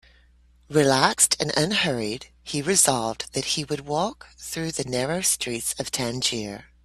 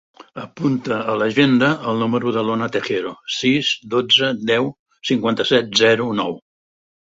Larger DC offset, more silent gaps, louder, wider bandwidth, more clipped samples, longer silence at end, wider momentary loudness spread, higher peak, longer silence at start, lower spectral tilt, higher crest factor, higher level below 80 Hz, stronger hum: neither; second, none vs 4.79-4.86 s; second, -23 LUFS vs -18 LUFS; first, 15.5 kHz vs 8 kHz; neither; second, 0.2 s vs 0.65 s; about the same, 13 LU vs 11 LU; about the same, -2 dBFS vs -2 dBFS; first, 0.7 s vs 0.35 s; second, -2.5 dB/octave vs -4.5 dB/octave; first, 24 dB vs 18 dB; first, -54 dBFS vs -60 dBFS; neither